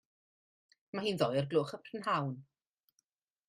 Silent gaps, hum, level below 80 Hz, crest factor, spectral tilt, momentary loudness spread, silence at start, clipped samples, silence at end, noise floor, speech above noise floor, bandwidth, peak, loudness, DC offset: none; none; -76 dBFS; 22 dB; -6 dB/octave; 10 LU; 0.95 s; under 0.1%; 1.05 s; -81 dBFS; 47 dB; 14 kHz; -16 dBFS; -35 LUFS; under 0.1%